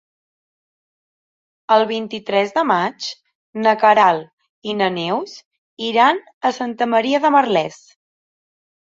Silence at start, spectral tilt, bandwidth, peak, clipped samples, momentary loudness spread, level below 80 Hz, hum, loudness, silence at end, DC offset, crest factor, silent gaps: 1.7 s; -4.5 dB/octave; 7.8 kHz; -2 dBFS; under 0.1%; 14 LU; -68 dBFS; none; -17 LUFS; 1.25 s; under 0.1%; 18 dB; 3.35-3.53 s, 4.33-4.37 s, 4.50-4.62 s, 5.45-5.51 s, 5.58-5.77 s, 6.33-6.41 s